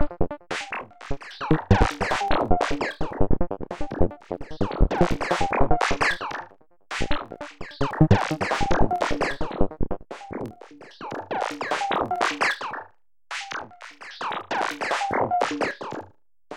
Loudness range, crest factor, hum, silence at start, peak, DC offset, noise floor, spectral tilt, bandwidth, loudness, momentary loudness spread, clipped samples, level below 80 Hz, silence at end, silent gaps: 3 LU; 18 dB; none; 0 s; -6 dBFS; under 0.1%; -53 dBFS; -5.5 dB/octave; 11 kHz; -26 LUFS; 14 LU; under 0.1%; -34 dBFS; 0 s; none